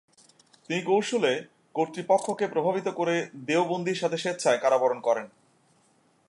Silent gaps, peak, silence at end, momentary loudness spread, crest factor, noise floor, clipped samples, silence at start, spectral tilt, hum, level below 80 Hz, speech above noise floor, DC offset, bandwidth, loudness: none; -10 dBFS; 1 s; 7 LU; 18 dB; -65 dBFS; under 0.1%; 0.7 s; -4.5 dB/octave; none; -82 dBFS; 39 dB; under 0.1%; 11.5 kHz; -27 LUFS